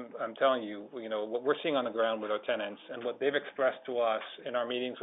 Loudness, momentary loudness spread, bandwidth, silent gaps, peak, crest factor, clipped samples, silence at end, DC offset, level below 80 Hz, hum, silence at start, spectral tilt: -33 LUFS; 9 LU; 4 kHz; none; -14 dBFS; 20 dB; under 0.1%; 0 s; under 0.1%; -82 dBFS; none; 0 s; -7.5 dB/octave